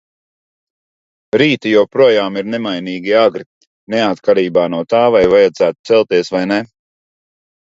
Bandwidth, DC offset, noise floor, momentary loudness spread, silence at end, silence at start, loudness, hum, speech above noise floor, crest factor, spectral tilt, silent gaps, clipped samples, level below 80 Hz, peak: 7.8 kHz; under 0.1%; under -90 dBFS; 9 LU; 1.1 s; 1.35 s; -13 LUFS; none; over 77 dB; 14 dB; -6 dB/octave; 3.46-3.61 s, 3.67-3.87 s, 5.79-5.84 s; under 0.1%; -52 dBFS; 0 dBFS